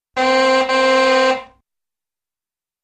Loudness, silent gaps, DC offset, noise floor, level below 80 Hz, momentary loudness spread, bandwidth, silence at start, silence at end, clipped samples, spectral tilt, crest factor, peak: -15 LUFS; none; under 0.1%; under -90 dBFS; -58 dBFS; 5 LU; 9.4 kHz; 0.15 s; 1.4 s; under 0.1%; -1.5 dB/octave; 14 dB; -4 dBFS